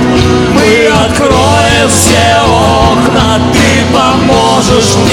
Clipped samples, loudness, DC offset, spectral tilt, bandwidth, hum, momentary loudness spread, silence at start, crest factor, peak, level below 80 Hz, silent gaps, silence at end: 1%; -6 LUFS; under 0.1%; -4.5 dB/octave; 19 kHz; none; 2 LU; 0 s; 6 dB; 0 dBFS; -22 dBFS; none; 0 s